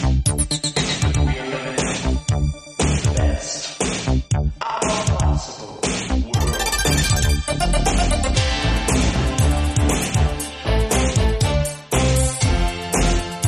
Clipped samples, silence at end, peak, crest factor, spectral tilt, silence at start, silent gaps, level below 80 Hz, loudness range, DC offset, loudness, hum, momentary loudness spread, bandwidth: under 0.1%; 0 s; -4 dBFS; 14 dB; -4.5 dB/octave; 0 s; none; -24 dBFS; 3 LU; under 0.1%; -20 LUFS; none; 5 LU; 13.5 kHz